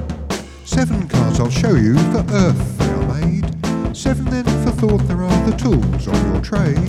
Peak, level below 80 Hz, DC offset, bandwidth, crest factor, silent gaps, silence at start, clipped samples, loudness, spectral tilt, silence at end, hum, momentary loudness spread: -2 dBFS; -26 dBFS; 0.1%; 13.5 kHz; 14 dB; none; 0 s; under 0.1%; -17 LUFS; -7 dB/octave; 0 s; none; 6 LU